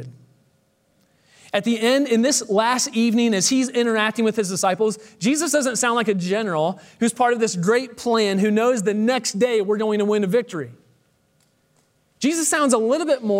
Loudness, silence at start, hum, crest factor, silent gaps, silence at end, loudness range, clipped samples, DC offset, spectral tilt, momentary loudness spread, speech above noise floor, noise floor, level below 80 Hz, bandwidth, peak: -20 LUFS; 0 s; none; 16 dB; none; 0 s; 4 LU; under 0.1%; under 0.1%; -3.5 dB/octave; 6 LU; 44 dB; -64 dBFS; -72 dBFS; 16 kHz; -6 dBFS